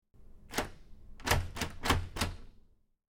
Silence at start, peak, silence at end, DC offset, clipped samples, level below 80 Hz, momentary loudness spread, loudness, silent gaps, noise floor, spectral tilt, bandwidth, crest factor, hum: 0.15 s; -14 dBFS; 0.6 s; under 0.1%; under 0.1%; -44 dBFS; 9 LU; -35 LUFS; none; -61 dBFS; -3.5 dB/octave; 17.5 kHz; 24 dB; none